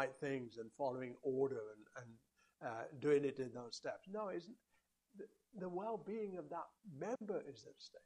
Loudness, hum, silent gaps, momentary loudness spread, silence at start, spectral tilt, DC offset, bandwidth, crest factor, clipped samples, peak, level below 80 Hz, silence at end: -44 LUFS; none; none; 18 LU; 0 s; -6 dB/octave; under 0.1%; 10.5 kHz; 20 dB; under 0.1%; -24 dBFS; -86 dBFS; 0.05 s